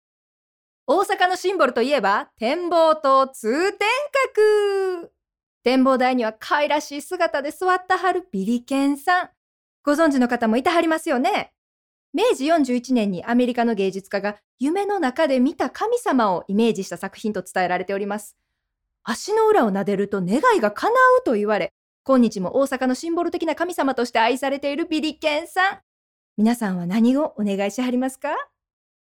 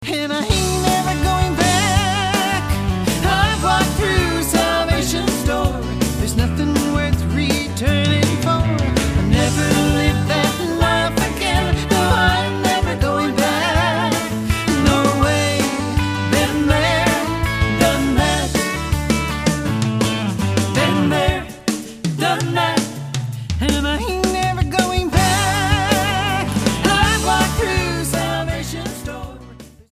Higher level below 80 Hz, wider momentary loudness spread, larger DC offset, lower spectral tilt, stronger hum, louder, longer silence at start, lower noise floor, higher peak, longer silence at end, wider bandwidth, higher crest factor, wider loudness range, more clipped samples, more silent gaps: second, -64 dBFS vs -28 dBFS; first, 9 LU vs 5 LU; neither; about the same, -5 dB/octave vs -4.5 dB/octave; neither; second, -21 LUFS vs -17 LUFS; first, 0.9 s vs 0 s; first, -79 dBFS vs -39 dBFS; second, -6 dBFS vs 0 dBFS; first, 0.65 s vs 0.2 s; first, 17.5 kHz vs 15.5 kHz; about the same, 16 dB vs 18 dB; about the same, 3 LU vs 2 LU; neither; first, 5.43-5.61 s, 9.37-9.84 s, 11.58-12.13 s, 14.44-14.58 s, 21.71-22.04 s, 25.83-26.36 s vs none